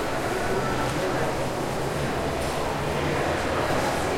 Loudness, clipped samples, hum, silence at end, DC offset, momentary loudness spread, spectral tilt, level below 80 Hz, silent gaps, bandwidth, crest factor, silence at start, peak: -26 LUFS; under 0.1%; none; 0 s; under 0.1%; 3 LU; -5 dB/octave; -42 dBFS; none; 16.5 kHz; 14 dB; 0 s; -12 dBFS